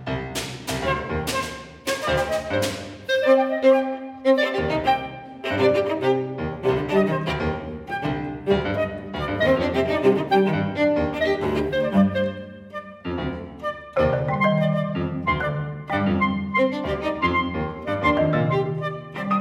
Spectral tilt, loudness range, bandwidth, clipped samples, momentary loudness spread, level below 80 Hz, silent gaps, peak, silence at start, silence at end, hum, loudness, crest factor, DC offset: -6 dB/octave; 3 LU; 16 kHz; under 0.1%; 10 LU; -44 dBFS; none; -6 dBFS; 0 s; 0 s; none; -23 LUFS; 16 dB; under 0.1%